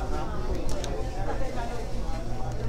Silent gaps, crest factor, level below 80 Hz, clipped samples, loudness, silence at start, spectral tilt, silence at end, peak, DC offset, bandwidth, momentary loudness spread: none; 14 dB; -32 dBFS; under 0.1%; -34 LUFS; 0 s; -6 dB/octave; 0 s; -14 dBFS; under 0.1%; 12 kHz; 2 LU